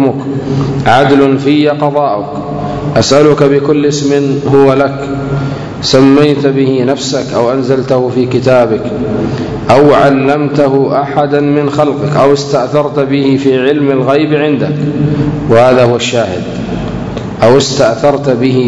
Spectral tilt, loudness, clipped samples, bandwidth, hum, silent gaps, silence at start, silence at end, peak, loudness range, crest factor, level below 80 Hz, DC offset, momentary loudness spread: -6 dB/octave; -10 LUFS; 2%; 9.8 kHz; none; none; 0 s; 0 s; 0 dBFS; 1 LU; 10 dB; -36 dBFS; under 0.1%; 9 LU